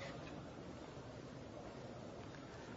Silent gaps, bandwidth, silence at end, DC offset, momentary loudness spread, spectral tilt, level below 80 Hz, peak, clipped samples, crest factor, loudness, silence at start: none; 7.6 kHz; 0 s; under 0.1%; 2 LU; -5 dB/octave; -66 dBFS; -38 dBFS; under 0.1%; 14 dB; -52 LUFS; 0 s